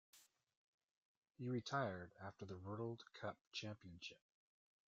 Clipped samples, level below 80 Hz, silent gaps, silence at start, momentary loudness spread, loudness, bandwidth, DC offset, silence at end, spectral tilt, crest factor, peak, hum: under 0.1%; -84 dBFS; 0.57-0.78 s, 0.91-1.22 s, 1.31-1.35 s, 3.41-3.52 s; 0.15 s; 12 LU; -50 LUFS; 7.6 kHz; under 0.1%; 0.75 s; -4.5 dB/octave; 22 dB; -28 dBFS; none